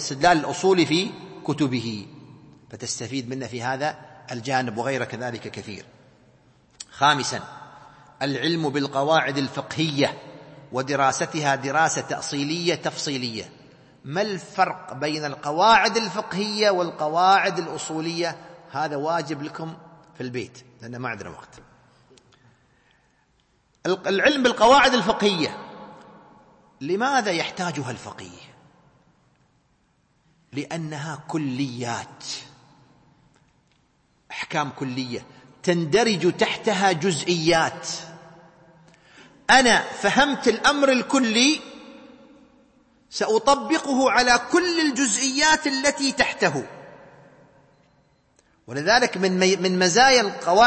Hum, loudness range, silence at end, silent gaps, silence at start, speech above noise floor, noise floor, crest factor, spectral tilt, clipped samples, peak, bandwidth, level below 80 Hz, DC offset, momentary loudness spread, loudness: none; 13 LU; 0 s; none; 0 s; 43 dB; -65 dBFS; 20 dB; -3.5 dB/octave; under 0.1%; -4 dBFS; 8.8 kHz; -58 dBFS; under 0.1%; 17 LU; -22 LUFS